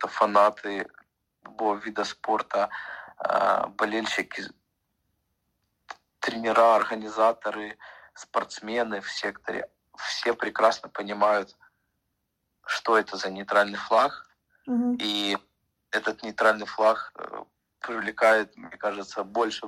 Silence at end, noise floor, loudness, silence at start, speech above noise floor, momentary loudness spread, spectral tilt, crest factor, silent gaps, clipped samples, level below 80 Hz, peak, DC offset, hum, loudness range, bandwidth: 0 s; -78 dBFS; -26 LUFS; 0 s; 52 dB; 18 LU; -3.5 dB/octave; 22 dB; none; under 0.1%; -70 dBFS; -6 dBFS; under 0.1%; none; 3 LU; 13.5 kHz